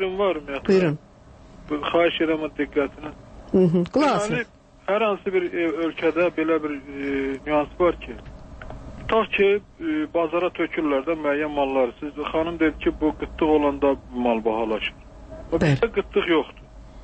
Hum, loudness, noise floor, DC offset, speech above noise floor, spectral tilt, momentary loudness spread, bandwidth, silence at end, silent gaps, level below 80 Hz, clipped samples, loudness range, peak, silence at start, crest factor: none; -23 LUFS; -47 dBFS; under 0.1%; 25 dB; -6.5 dB/octave; 14 LU; 8.8 kHz; 0 s; none; -44 dBFS; under 0.1%; 2 LU; -8 dBFS; 0 s; 16 dB